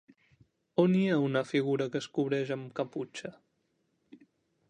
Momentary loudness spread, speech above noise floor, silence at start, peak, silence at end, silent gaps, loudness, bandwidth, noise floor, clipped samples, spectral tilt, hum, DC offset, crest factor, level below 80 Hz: 13 LU; 46 dB; 0.8 s; -12 dBFS; 0.55 s; none; -31 LUFS; 9.6 kHz; -76 dBFS; under 0.1%; -7 dB/octave; none; under 0.1%; 20 dB; -78 dBFS